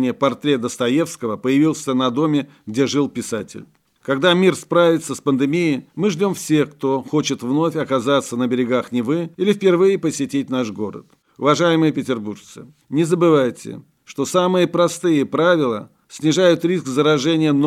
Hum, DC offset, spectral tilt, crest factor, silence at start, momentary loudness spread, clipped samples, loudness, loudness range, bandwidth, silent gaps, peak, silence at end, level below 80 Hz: none; under 0.1%; -5.5 dB/octave; 16 dB; 0 s; 10 LU; under 0.1%; -18 LUFS; 2 LU; 15 kHz; none; -2 dBFS; 0 s; -66 dBFS